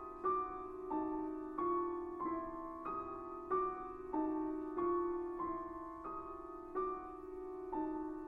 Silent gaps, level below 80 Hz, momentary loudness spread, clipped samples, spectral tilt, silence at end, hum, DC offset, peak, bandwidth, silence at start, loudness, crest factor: none; -62 dBFS; 9 LU; under 0.1%; -9 dB/octave; 0 s; none; under 0.1%; -26 dBFS; 3.8 kHz; 0 s; -42 LUFS; 16 dB